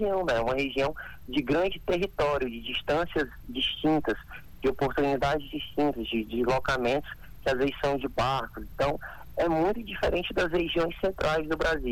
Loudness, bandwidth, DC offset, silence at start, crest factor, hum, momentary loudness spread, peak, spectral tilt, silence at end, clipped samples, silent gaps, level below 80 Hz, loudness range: -29 LUFS; 19 kHz; under 0.1%; 0 s; 14 dB; none; 6 LU; -14 dBFS; -5.5 dB/octave; 0 s; under 0.1%; none; -44 dBFS; 1 LU